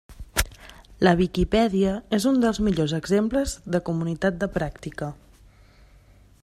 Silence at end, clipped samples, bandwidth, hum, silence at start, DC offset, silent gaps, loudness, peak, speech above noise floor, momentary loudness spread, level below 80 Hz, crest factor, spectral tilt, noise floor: 1.3 s; under 0.1%; 16 kHz; none; 0.1 s; under 0.1%; none; -24 LUFS; -4 dBFS; 30 dB; 11 LU; -40 dBFS; 20 dB; -5.5 dB/octave; -53 dBFS